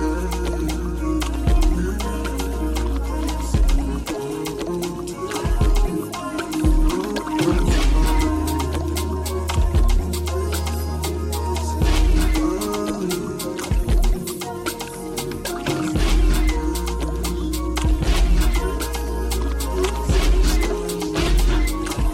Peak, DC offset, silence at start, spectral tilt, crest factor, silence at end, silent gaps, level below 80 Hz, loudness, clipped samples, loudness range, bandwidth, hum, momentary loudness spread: -6 dBFS; under 0.1%; 0 s; -5.5 dB/octave; 12 dB; 0 s; none; -22 dBFS; -23 LUFS; under 0.1%; 3 LU; 16 kHz; none; 7 LU